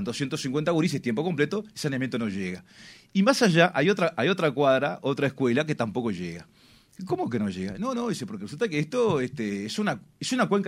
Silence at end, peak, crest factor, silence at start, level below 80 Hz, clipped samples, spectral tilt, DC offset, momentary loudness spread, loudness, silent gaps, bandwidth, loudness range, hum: 0 s; -6 dBFS; 22 dB; 0 s; -64 dBFS; under 0.1%; -5.5 dB/octave; under 0.1%; 11 LU; -26 LUFS; none; 15.5 kHz; 6 LU; none